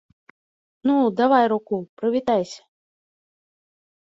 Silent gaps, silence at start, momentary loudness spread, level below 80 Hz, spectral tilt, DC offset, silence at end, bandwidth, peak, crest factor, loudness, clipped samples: 1.89-1.97 s; 0.85 s; 12 LU; -68 dBFS; -6 dB/octave; under 0.1%; 1.5 s; 7.8 kHz; -4 dBFS; 20 dB; -21 LUFS; under 0.1%